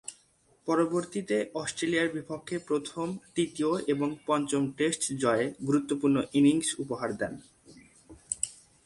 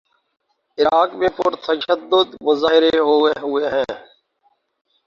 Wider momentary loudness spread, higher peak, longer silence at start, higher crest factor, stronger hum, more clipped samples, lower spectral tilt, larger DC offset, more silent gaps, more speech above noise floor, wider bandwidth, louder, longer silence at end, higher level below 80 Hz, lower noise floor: about the same, 10 LU vs 8 LU; second, -10 dBFS vs -2 dBFS; second, 0.1 s vs 0.8 s; about the same, 20 dB vs 16 dB; neither; neither; about the same, -4.5 dB/octave vs -5 dB/octave; neither; neither; second, 37 dB vs 47 dB; first, 11.5 kHz vs 7 kHz; second, -29 LUFS vs -17 LUFS; second, 0.3 s vs 1.1 s; second, -66 dBFS vs -56 dBFS; about the same, -65 dBFS vs -64 dBFS